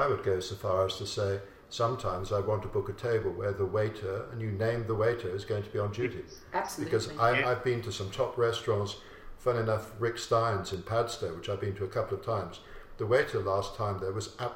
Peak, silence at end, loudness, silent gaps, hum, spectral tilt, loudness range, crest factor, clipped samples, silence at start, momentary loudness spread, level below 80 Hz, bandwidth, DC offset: -12 dBFS; 0 s; -32 LUFS; none; none; -5.5 dB/octave; 2 LU; 20 dB; under 0.1%; 0 s; 8 LU; -54 dBFS; 16.5 kHz; under 0.1%